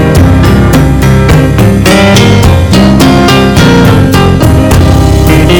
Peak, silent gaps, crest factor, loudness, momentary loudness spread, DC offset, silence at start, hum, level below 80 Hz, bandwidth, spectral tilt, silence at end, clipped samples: 0 dBFS; none; 4 dB; -4 LUFS; 2 LU; under 0.1%; 0 s; none; -12 dBFS; over 20 kHz; -6 dB/octave; 0 s; 30%